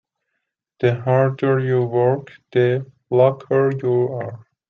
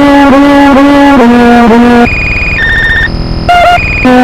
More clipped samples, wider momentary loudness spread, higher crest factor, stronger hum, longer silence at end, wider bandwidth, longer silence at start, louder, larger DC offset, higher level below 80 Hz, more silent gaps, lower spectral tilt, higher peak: second, under 0.1% vs 10%; first, 8 LU vs 5 LU; first, 16 dB vs 4 dB; neither; first, 0.3 s vs 0 s; second, 4.3 kHz vs 14.5 kHz; first, 0.8 s vs 0 s; second, -19 LUFS vs -4 LUFS; neither; second, -64 dBFS vs -18 dBFS; neither; first, -10 dB/octave vs -6 dB/octave; second, -4 dBFS vs 0 dBFS